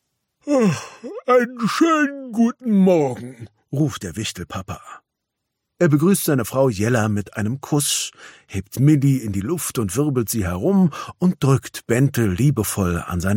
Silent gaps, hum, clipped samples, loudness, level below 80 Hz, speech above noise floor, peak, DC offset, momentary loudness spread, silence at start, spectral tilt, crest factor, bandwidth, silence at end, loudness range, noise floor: none; none; under 0.1%; -20 LUFS; -48 dBFS; 60 dB; -4 dBFS; under 0.1%; 13 LU; 0.45 s; -6 dB/octave; 16 dB; 17 kHz; 0 s; 3 LU; -79 dBFS